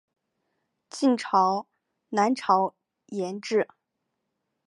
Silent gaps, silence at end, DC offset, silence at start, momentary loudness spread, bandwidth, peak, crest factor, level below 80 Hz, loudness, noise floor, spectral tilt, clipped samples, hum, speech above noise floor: none; 1 s; under 0.1%; 0.95 s; 11 LU; 11.5 kHz; -8 dBFS; 20 dB; -84 dBFS; -26 LUFS; -81 dBFS; -5 dB/octave; under 0.1%; none; 56 dB